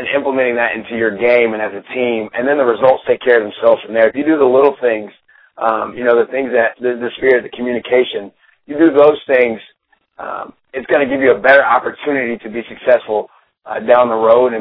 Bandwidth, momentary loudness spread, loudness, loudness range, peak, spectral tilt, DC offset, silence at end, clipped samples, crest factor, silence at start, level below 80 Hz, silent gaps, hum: 5.2 kHz; 15 LU; -14 LUFS; 2 LU; 0 dBFS; -8 dB/octave; under 0.1%; 0 s; under 0.1%; 14 dB; 0 s; -56 dBFS; none; none